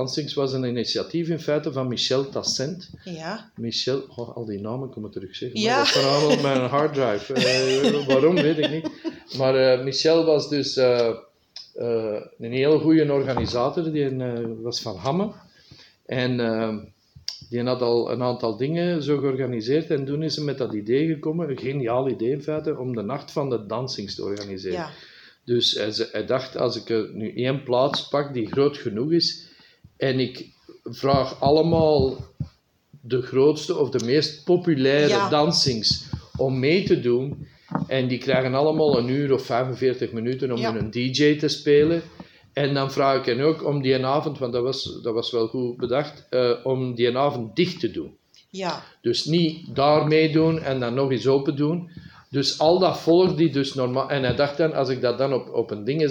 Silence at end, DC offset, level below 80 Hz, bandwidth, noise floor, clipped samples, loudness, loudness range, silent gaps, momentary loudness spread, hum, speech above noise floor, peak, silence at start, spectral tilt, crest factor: 0 s; under 0.1%; -58 dBFS; 16.5 kHz; -55 dBFS; under 0.1%; -23 LUFS; 6 LU; none; 12 LU; none; 32 dB; -6 dBFS; 0 s; -5.5 dB/octave; 18 dB